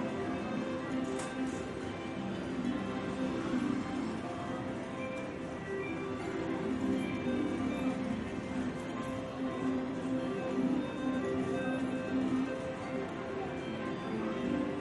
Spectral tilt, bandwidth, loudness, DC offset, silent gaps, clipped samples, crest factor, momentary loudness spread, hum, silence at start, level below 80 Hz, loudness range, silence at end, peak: -6.5 dB/octave; 11.5 kHz; -36 LUFS; under 0.1%; none; under 0.1%; 14 dB; 5 LU; none; 0 s; -60 dBFS; 2 LU; 0 s; -22 dBFS